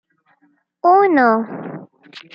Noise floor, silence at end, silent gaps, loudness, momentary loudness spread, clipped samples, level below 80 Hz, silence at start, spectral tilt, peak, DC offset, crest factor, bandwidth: -61 dBFS; 0.15 s; none; -14 LUFS; 20 LU; under 0.1%; -70 dBFS; 0.85 s; -8 dB/octave; -2 dBFS; under 0.1%; 16 dB; 6 kHz